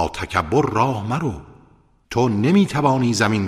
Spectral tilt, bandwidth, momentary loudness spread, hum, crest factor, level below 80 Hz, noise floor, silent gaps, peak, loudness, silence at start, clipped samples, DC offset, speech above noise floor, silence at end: -6 dB/octave; 14 kHz; 9 LU; none; 18 dB; -44 dBFS; -54 dBFS; none; -2 dBFS; -19 LUFS; 0 s; under 0.1%; under 0.1%; 35 dB; 0 s